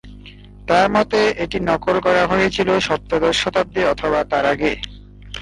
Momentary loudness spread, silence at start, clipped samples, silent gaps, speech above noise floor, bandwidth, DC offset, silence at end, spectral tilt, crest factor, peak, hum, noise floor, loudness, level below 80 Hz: 6 LU; 0.05 s; under 0.1%; none; 22 dB; 11.5 kHz; under 0.1%; 0 s; -4.5 dB/octave; 16 dB; -4 dBFS; 50 Hz at -40 dBFS; -39 dBFS; -18 LUFS; -40 dBFS